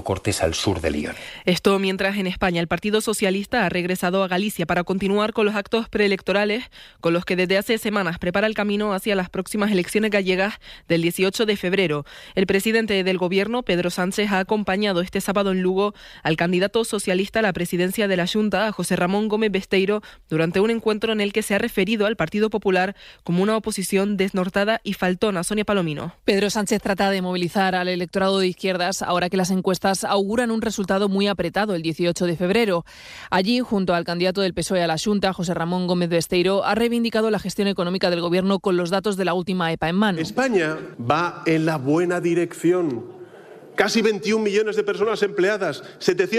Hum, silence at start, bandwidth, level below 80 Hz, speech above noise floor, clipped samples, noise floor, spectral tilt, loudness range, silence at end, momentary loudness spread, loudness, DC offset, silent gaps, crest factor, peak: none; 0 s; 15.5 kHz; -50 dBFS; 22 dB; under 0.1%; -43 dBFS; -5 dB/octave; 1 LU; 0 s; 4 LU; -22 LUFS; under 0.1%; none; 18 dB; -4 dBFS